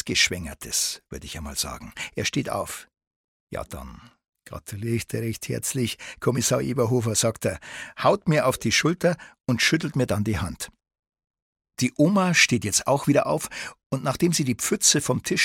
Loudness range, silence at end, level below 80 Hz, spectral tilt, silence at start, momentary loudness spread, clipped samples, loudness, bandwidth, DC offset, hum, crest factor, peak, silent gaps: 10 LU; 0 s; -50 dBFS; -3.5 dB/octave; 0.05 s; 17 LU; under 0.1%; -23 LUFS; 17.5 kHz; under 0.1%; none; 20 dB; -6 dBFS; 3.07-3.47 s, 4.28-4.32 s, 11.30-11.34 s, 11.42-11.56 s, 13.86-13.90 s